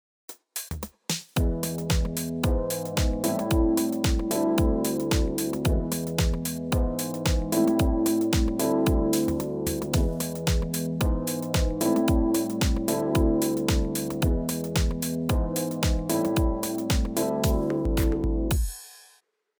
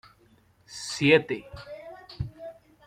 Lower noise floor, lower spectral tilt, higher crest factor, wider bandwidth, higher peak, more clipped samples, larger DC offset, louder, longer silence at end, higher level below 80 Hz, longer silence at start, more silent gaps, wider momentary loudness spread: about the same, -63 dBFS vs -61 dBFS; about the same, -5.5 dB/octave vs -5 dB/octave; second, 14 dB vs 24 dB; first, over 20 kHz vs 13.5 kHz; second, -10 dBFS vs -6 dBFS; neither; neither; about the same, -26 LUFS vs -26 LUFS; first, 0.6 s vs 0.35 s; first, -30 dBFS vs -54 dBFS; second, 0.3 s vs 0.7 s; neither; second, 5 LU vs 24 LU